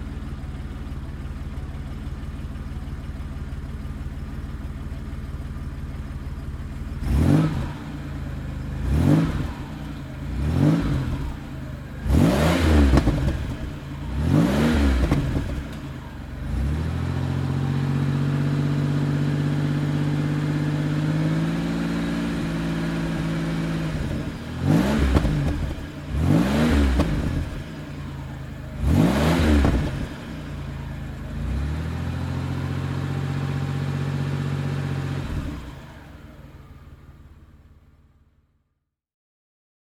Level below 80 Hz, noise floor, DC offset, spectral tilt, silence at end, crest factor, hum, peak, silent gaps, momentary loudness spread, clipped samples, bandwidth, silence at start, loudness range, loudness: -30 dBFS; -76 dBFS; under 0.1%; -7 dB/octave; 2.25 s; 22 dB; none; -2 dBFS; none; 14 LU; under 0.1%; 15.5 kHz; 0 s; 12 LU; -25 LUFS